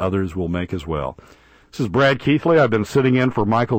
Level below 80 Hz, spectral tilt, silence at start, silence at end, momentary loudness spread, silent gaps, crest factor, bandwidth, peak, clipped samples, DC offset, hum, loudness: -44 dBFS; -7 dB/octave; 0 s; 0 s; 10 LU; none; 14 dB; 16 kHz; -4 dBFS; under 0.1%; under 0.1%; none; -19 LUFS